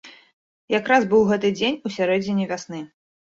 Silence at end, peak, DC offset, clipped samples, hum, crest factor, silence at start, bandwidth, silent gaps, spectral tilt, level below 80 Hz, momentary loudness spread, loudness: 0.4 s; -4 dBFS; under 0.1%; under 0.1%; none; 18 dB; 0.05 s; 7.8 kHz; 0.33-0.68 s; -5.5 dB/octave; -60 dBFS; 16 LU; -21 LUFS